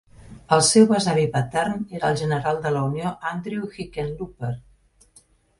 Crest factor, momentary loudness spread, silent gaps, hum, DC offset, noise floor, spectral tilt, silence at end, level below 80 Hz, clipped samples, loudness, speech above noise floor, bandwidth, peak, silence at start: 20 dB; 15 LU; none; none; under 0.1%; -57 dBFS; -4.5 dB/octave; 1 s; -52 dBFS; under 0.1%; -22 LUFS; 35 dB; 11.5 kHz; -2 dBFS; 0.25 s